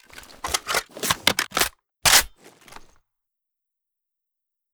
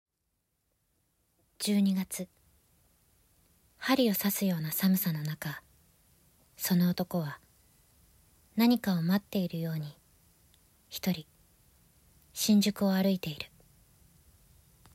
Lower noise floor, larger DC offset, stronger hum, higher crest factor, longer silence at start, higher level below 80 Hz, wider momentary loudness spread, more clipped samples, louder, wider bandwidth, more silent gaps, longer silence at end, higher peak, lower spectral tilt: about the same, -84 dBFS vs -81 dBFS; neither; neither; first, 26 dB vs 20 dB; second, 0.15 s vs 1.6 s; first, -48 dBFS vs -68 dBFS; second, 11 LU vs 14 LU; neither; first, -20 LUFS vs -30 LUFS; first, over 20 kHz vs 16 kHz; neither; first, 2.45 s vs 1.5 s; first, 0 dBFS vs -14 dBFS; second, 0 dB/octave vs -5 dB/octave